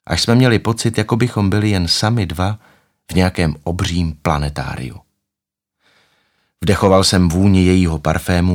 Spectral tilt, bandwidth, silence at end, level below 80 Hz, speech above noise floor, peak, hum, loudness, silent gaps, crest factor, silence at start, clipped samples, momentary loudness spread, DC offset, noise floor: -5.5 dB/octave; 16.5 kHz; 0 s; -34 dBFS; 68 dB; 0 dBFS; none; -16 LUFS; none; 16 dB; 0.1 s; under 0.1%; 10 LU; under 0.1%; -83 dBFS